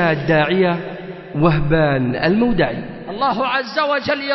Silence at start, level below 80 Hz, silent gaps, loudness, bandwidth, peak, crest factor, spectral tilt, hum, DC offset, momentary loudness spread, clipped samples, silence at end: 0 s; -36 dBFS; none; -17 LUFS; 6 kHz; -2 dBFS; 16 dB; -8 dB/octave; none; under 0.1%; 12 LU; under 0.1%; 0 s